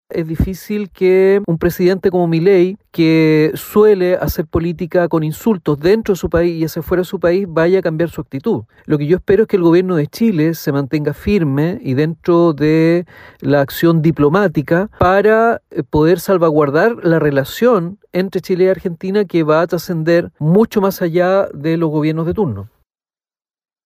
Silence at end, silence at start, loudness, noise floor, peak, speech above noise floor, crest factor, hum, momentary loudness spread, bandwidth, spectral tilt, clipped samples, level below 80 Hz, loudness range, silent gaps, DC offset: 1.2 s; 0.1 s; -15 LUFS; under -90 dBFS; -2 dBFS; over 76 dB; 12 dB; none; 7 LU; 16 kHz; -7.5 dB/octave; under 0.1%; -38 dBFS; 3 LU; none; under 0.1%